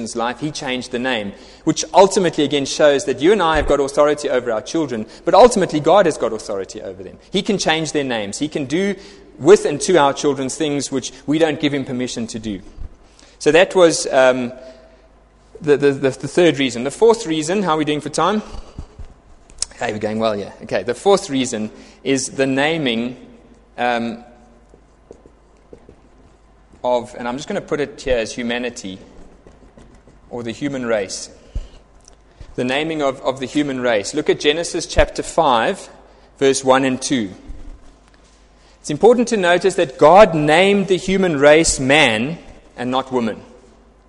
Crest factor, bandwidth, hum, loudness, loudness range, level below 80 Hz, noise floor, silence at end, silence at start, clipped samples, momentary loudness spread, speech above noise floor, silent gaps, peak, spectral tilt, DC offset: 18 dB; 11.5 kHz; none; -17 LUFS; 11 LU; -40 dBFS; -49 dBFS; 0.65 s; 0 s; under 0.1%; 15 LU; 32 dB; none; 0 dBFS; -4 dB/octave; under 0.1%